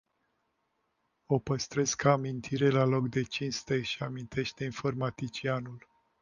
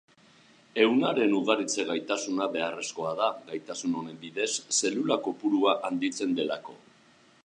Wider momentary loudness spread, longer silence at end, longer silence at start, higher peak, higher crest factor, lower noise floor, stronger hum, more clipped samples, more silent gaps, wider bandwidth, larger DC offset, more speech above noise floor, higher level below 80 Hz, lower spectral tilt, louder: about the same, 9 LU vs 10 LU; second, 0.4 s vs 0.65 s; first, 1.3 s vs 0.75 s; about the same, -10 dBFS vs -8 dBFS; about the same, 22 dB vs 20 dB; first, -78 dBFS vs -60 dBFS; neither; neither; neither; second, 9.8 kHz vs 11 kHz; neither; first, 47 dB vs 32 dB; first, -62 dBFS vs -82 dBFS; first, -5 dB/octave vs -3 dB/octave; second, -31 LUFS vs -28 LUFS